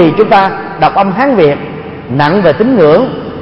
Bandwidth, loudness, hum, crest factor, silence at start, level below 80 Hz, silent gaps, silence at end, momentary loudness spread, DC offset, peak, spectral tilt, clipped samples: 5.8 kHz; -9 LUFS; none; 8 dB; 0 s; -40 dBFS; none; 0 s; 11 LU; under 0.1%; 0 dBFS; -8.5 dB/octave; 0.4%